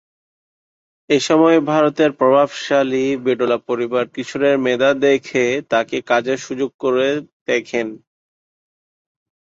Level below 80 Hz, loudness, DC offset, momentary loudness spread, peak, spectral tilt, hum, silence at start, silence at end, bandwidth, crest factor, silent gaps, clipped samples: -64 dBFS; -17 LUFS; under 0.1%; 8 LU; -2 dBFS; -5 dB/octave; none; 1.1 s; 1.6 s; 8 kHz; 16 dB; 6.74-6.79 s, 7.33-7.46 s; under 0.1%